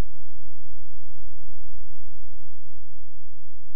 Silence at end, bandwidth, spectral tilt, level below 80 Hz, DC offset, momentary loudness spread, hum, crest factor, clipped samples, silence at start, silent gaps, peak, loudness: 0 s; 2.9 kHz; -10.5 dB/octave; -48 dBFS; 30%; 4 LU; none; 6 dB; under 0.1%; 0 s; none; -10 dBFS; -50 LUFS